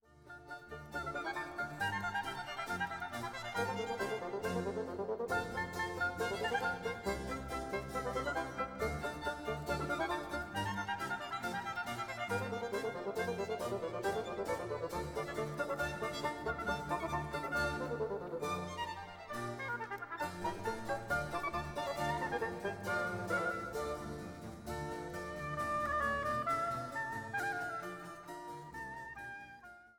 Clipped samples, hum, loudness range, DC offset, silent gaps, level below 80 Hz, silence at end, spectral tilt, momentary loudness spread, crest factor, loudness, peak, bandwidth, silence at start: under 0.1%; none; 2 LU; under 0.1%; none; -58 dBFS; 0.05 s; -4.5 dB/octave; 9 LU; 18 dB; -39 LUFS; -22 dBFS; 18 kHz; 0.1 s